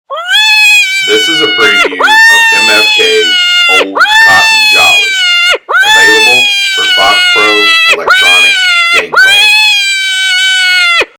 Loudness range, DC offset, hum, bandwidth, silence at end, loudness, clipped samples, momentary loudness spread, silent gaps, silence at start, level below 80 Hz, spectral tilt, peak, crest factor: 1 LU; under 0.1%; none; over 20 kHz; 0.15 s; -4 LUFS; 3%; 4 LU; none; 0.1 s; -48 dBFS; 0.5 dB/octave; 0 dBFS; 6 dB